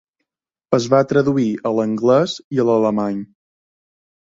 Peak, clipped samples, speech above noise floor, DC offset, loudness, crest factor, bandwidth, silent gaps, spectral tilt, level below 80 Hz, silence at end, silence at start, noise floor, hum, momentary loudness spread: -2 dBFS; under 0.1%; 64 dB; under 0.1%; -17 LUFS; 18 dB; 7.8 kHz; 2.44-2.51 s; -6.5 dB/octave; -60 dBFS; 1.05 s; 0.7 s; -81 dBFS; none; 6 LU